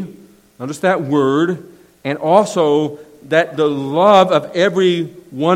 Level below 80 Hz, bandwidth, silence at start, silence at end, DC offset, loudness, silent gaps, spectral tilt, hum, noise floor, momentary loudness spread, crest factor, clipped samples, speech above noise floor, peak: -62 dBFS; 15.5 kHz; 0 s; 0 s; under 0.1%; -15 LUFS; none; -6 dB/octave; none; -43 dBFS; 16 LU; 16 dB; under 0.1%; 28 dB; 0 dBFS